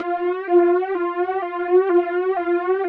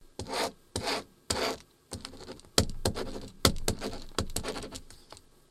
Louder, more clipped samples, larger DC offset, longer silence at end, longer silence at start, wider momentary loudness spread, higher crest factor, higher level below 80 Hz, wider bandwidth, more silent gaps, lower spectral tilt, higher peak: first, -20 LUFS vs -33 LUFS; neither; neither; second, 0 s vs 0.3 s; about the same, 0 s vs 0 s; second, 7 LU vs 18 LU; second, 14 dB vs 34 dB; second, -66 dBFS vs -44 dBFS; second, 4.1 kHz vs 16.5 kHz; neither; first, -7.5 dB/octave vs -3 dB/octave; second, -6 dBFS vs 0 dBFS